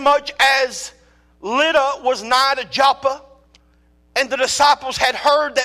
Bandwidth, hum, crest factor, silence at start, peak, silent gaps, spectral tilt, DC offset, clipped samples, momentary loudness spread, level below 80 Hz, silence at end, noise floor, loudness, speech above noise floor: 15.5 kHz; none; 14 dB; 0 s; -4 dBFS; none; -1 dB/octave; under 0.1%; under 0.1%; 9 LU; -52 dBFS; 0 s; -55 dBFS; -17 LUFS; 38 dB